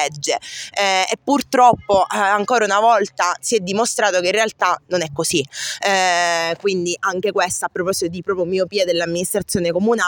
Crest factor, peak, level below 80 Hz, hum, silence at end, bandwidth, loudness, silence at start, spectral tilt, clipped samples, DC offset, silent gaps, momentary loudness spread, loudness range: 18 dB; 0 dBFS; -56 dBFS; none; 0 s; 17 kHz; -18 LUFS; 0 s; -3 dB/octave; under 0.1%; under 0.1%; none; 7 LU; 3 LU